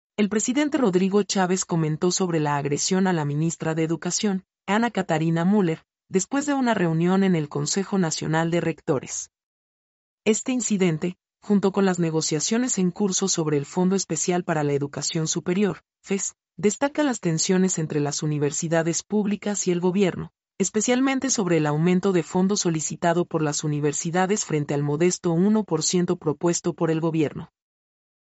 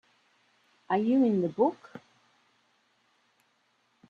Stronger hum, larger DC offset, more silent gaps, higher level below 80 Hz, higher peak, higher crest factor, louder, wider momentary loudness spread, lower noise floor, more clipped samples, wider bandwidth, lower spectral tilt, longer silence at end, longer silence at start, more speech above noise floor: neither; neither; first, 9.43-10.18 s vs none; first, -64 dBFS vs -76 dBFS; first, -8 dBFS vs -12 dBFS; second, 14 dB vs 20 dB; first, -23 LUFS vs -27 LUFS; second, 5 LU vs 25 LU; first, under -90 dBFS vs -71 dBFS; neither; first, 8.2 kHz vs 6.8 kHz; second, -5 dB/octave vs -9 dB/octave; second, 0.95 s vs 2.1 s; second, 0.2 s vs 0.9 s; first, over 67 dB vs 45 dB